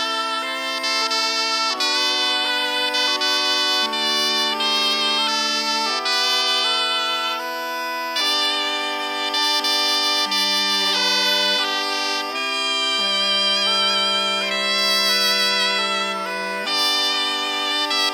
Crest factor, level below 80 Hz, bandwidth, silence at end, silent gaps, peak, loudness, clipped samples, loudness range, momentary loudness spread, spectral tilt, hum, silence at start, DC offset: 14 dB; -72 dBFS; 19 kHz; 0 s; none; -6 dBFS; -18 LUFS; under 0.1%; 2 LU; 6 LU; 0 dB/octave; none; 0 s; under 0.1%